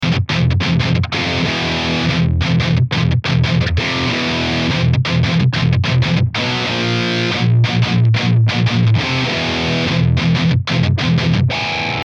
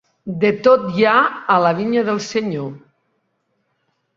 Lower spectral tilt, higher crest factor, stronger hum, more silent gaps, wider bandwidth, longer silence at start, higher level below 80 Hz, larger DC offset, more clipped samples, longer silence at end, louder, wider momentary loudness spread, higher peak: about the same, -6 dB/octave vs -6 dB/octave; second, 12 dB vs 18 dB; neither; neither; about the same, 7.8 kHz vs 7.6 kHz; second, 0 s vs 0.25 s; first, -32 dBFS vs -62 dBFS; neither; neither; second, 0.05 s vs 1.4 s; about the same, -15 LUFS vs -16 LUFS; second, 3 LU vs 12 LU; about the same, -2 dBFS vs 0 dBFS